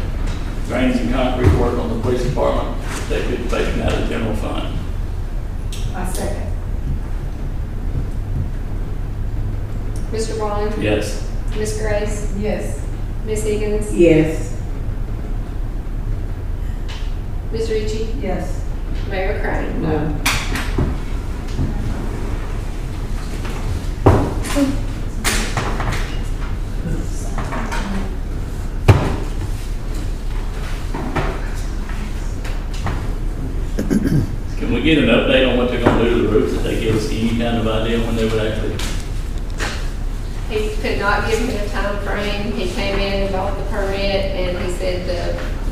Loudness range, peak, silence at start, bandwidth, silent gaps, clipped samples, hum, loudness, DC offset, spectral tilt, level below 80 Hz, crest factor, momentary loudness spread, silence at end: 8 LU; 0 dBFS; 0 s; 15.5 kHz; none; under 0.1%; none; -21 LUFS; 1%; -6 dB/octave; -22 dBFS; 18 dB; 11 LU; 0 s